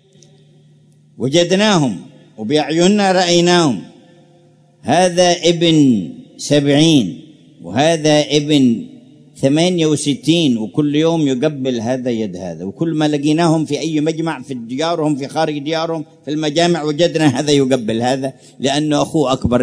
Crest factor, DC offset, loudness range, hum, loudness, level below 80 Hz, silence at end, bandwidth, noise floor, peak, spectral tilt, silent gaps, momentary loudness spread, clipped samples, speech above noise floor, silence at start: 16 dB; under 0.1%; 4 LU; none; -15 LUFS; -48 dBFS; 0 s; 11 kHz; -49 dBFS; 0 dBFS; -5 dB/octave; none; 12 LU; under 0.1%; 35 dB; 1.2 s